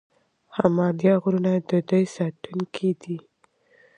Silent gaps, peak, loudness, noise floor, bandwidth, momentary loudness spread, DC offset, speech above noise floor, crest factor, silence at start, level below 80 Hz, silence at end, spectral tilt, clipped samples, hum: none; -4 dBFS; -23 LUFS; -62 dBFS; 9.2 kHz; 12 LU; under 0.1%; 39 dB; 22 dB; 0.55 s; -66 dBFS; 0.8 s; -8 dB/octave; under 0.1%; none